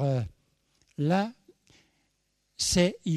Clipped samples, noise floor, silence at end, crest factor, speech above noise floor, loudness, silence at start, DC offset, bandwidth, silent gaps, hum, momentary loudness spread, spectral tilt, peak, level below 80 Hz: under 0.1%; -75 dBFS; 0 s; 20 dB; 48 dB; -28 LUFS; 0 s; under 0.1%; 13.5 kHz; none; none; 14 LU; -5 dB/octave; -10 dBFS; -52 dBFS